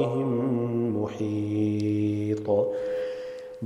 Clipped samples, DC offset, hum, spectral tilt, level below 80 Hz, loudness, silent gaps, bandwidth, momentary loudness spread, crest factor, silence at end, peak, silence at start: under 0.1%; under 0.1%; none; -9 dB/octave; -66 dBFS; -27 LUFS; none; 10.5 kHz; 6 LU; 16 dB; 0 s; -12 dBFS; 0 s